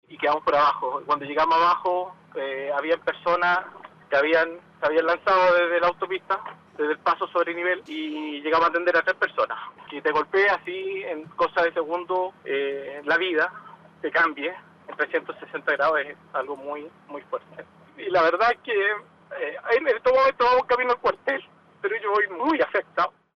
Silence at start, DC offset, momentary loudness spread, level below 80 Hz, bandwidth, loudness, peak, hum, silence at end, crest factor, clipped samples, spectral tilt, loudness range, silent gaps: 0.1 s; under 0.1%; 13 LU; -62 dBFS; 6.6 kHz; -24 LUFS; -10 dBFS; none; 0.25 s; 14 dB; under 0.1%; -5 dB/octave; 4 LU; none